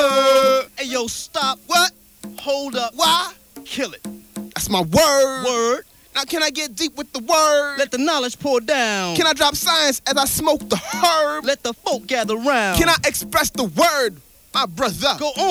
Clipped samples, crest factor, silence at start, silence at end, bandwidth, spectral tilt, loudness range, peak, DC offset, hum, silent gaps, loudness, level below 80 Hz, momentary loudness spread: under 0.1%; 16 dB; 0 s; 0 s; over 20 kHz; -2.5 dB/octave; 3 LU; -2 dBFS; under 0.1%; none; none; -18 LUFS; -44 dBFS; 10 LU